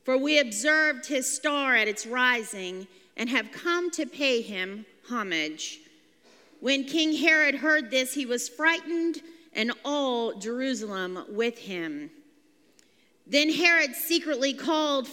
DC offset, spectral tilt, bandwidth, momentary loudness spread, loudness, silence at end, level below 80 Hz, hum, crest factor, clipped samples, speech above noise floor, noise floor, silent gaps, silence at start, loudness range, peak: under 0.1%; -2 dB/octave; 16.5 kHz; 14 LU; -26 LUFS; 0 s; -88 dBFS; none; 22 dB; under 0.1%; 36 dB; -63 dBFS; none; 0.05 s; 6 LU; -6 dBFS